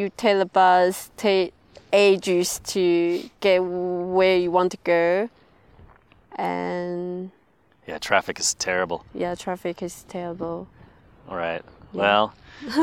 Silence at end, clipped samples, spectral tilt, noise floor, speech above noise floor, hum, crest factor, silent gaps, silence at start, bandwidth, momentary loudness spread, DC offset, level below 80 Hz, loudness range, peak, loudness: 0 s; under 0.1%; -4 dB/octave; -60 dBFS; 38 dB; none; 20 dB; none; 0 s; 16.5 kHz; 15 LU; under 0.1%; -58 dBFS; 8 LU; -2 dBFS; -23 LUFS